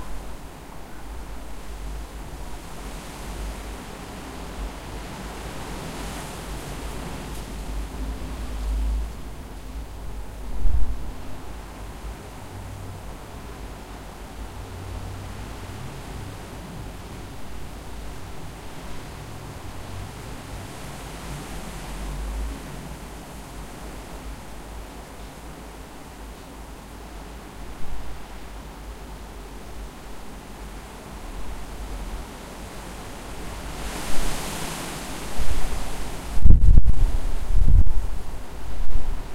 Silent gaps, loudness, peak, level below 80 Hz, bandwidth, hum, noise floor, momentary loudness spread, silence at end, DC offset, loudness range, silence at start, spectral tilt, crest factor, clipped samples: none; -33 LUFS; 0 dBFS; -28 dBFS; 14 kHz; none; -40 dBFS; 11 LU; 0 s; under 0.1%; 15 LU; 0 s; -5 dB/octave; 20 dB; under 0.1%